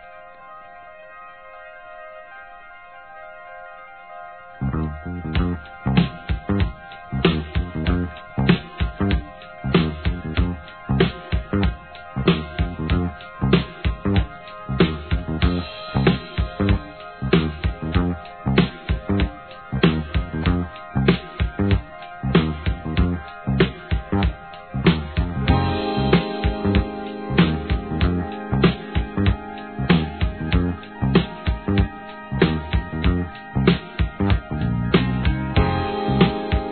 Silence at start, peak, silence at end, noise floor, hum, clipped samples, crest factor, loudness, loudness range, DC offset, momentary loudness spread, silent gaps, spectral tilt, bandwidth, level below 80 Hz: 0 s; 0 dBFS; 0 s; -42 dBFS; none; under 0.1%; 22 dB; -22 LUFS; 5 LU; 0.2%; 19 LU; none; -10.5 dB/octave; 4.5 kHz; -30 dBFS